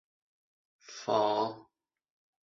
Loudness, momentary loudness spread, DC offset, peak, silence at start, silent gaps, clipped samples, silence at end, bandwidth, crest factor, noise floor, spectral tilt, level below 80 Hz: -31 LUFS; 20 LU; under 0.1%; -14 dBFS; 0.9 s; none; under 0.1%; 0.8 s; 7.6 kHz; 22 dB; -71 dBFS; -4.5 dB/octave; -80 dBFS